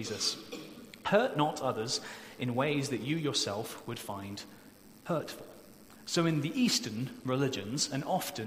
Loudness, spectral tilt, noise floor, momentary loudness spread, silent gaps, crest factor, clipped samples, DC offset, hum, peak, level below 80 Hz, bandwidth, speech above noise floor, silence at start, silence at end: -33 LUFS; -4 dB/octave; -54 dBFS; 16 LU; none; 22 dB; under 0.1%; under 0.1%; none; -12 dBFS; -70 dBFS; 16 kHz; 21 dB; 0 s; 0 s